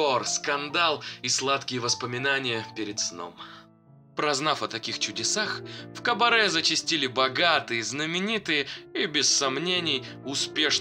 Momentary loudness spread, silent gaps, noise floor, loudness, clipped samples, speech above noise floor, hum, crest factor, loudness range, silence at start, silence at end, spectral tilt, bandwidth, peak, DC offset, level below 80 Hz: 10 LU; none; -55 dBFS; -25 LUFS; under 0.1%; 28 dB; none; 20 dB; 5 LU; 0 s; 0 s; -1.5 dB/octave; 16 kHz; -6 dBFS; under 0.1%; -70 dBFS